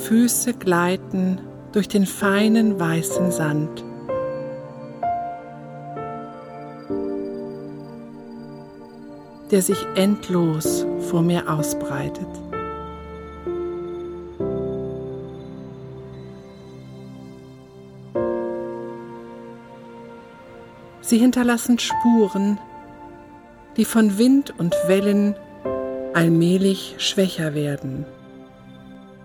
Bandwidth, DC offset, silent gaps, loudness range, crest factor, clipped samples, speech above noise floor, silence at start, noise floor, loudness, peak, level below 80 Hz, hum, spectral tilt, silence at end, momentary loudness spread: 18.5 kHz; under 0.1%; none; 12 LU; 18 dB; under 0.1%; 25 dB; 0 s; -44 dBFS; -22 LUFS; -6 dBFS; -52 dBFS; none; -5.5 dB/octave; 0 s; 23 LU